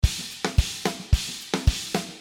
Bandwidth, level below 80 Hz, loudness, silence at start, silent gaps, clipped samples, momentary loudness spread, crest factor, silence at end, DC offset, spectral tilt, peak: 17 kHz; -28 dBFS; -26 LUFS; 0.05 s; none; under 0.1%; 4 LU; 20 dB; 0 s; under 0.1%; -4 dB/octave; -6 dBFS